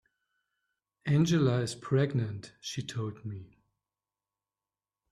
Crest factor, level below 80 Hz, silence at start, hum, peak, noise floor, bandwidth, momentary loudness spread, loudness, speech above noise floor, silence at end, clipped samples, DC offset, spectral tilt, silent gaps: 18 dB; -66 dBFS; 1.05 s; none; -14 dBFS; under -90 dBFS; 12.5 kHz; 15 LU; -31 LUFS; over 60 dB; 1.65 s; under 0.1%; under 0.1%; -6.5 dB/octave; none